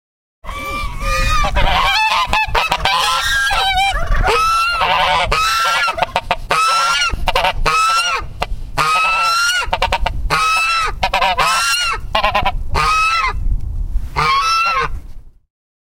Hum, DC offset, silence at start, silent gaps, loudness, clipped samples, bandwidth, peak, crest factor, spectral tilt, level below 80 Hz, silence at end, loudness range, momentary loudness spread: none; 0.4%; 0.45 s; none; -15 LUFS; under 0.1%; 16.5 kHz; 0 dBFS; 16 dB; -2 dB/octave; -24 dBFS; 0.6 s; 2 LU; 10 LU